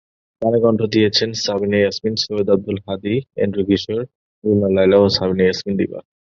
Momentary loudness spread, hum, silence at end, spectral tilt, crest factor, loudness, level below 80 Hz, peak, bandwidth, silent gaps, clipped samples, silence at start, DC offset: 11 LU; none; 0.4 s; -5.5 dB/octave; 16 dB; -18 LUFS; -46 dBFS; 0 dBFS; 7.4 kHz; 4.15-4.42 s; under 0.1%; 0.4 s; under 0.1%